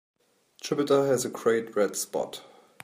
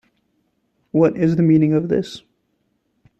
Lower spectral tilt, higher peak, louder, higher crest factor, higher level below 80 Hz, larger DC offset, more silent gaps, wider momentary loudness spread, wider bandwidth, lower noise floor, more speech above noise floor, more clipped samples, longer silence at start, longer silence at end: second, -4 dB/octave vs -9 dB/octave; second, -10 dBFS vs -4 dBFS; second, -27 LUFS vs -17 LUFS; about the same, 18 dB vs 16 dB; second, -76 dBFS vs -56 dBFS; neither; neither; about the same, 13 LU vs 13 LU; first, 15.5 kHz vs 8.2 kHz; second, -59 dBFS vs -68 dBFS; second, 32 dB vs 52 dB; neither; second, 0.65 s vs 0.95 s; second, 0.45 s vs 1 s